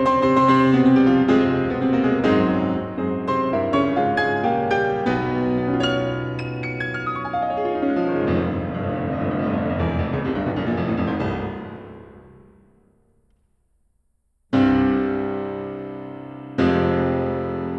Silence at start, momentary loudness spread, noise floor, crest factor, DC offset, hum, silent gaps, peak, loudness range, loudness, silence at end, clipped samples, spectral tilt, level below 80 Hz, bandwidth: 0 s; 12 LU; -66 dBFS; 16 dB; under 0.1%; none; none; -6 dBFS; 8 LU; -21 LUFS; 0 s; under 0.1%; -8 dB/octave; -44 dBFS; 7.8 kHz